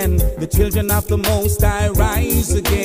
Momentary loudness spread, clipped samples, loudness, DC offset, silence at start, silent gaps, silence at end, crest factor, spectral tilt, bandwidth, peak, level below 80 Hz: 2 LU; under 0.1%; -17 LUFS; under 0.1%; 0 s; none; 0 s; 14 dB; -5 dB/octave; 16.5 kHz; -2 dBFS; -20 dBFS